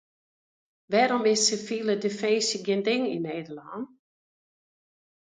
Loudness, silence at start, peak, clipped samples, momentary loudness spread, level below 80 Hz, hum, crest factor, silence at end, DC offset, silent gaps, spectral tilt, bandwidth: -25 LUFS; 0.9 s; -10 dBFS; under 0.1%; 16 LU; -76 dBFS; none; 18 dB; 1.4 s; under 0.1%; none; -3 dB/octave; 9.6 kHz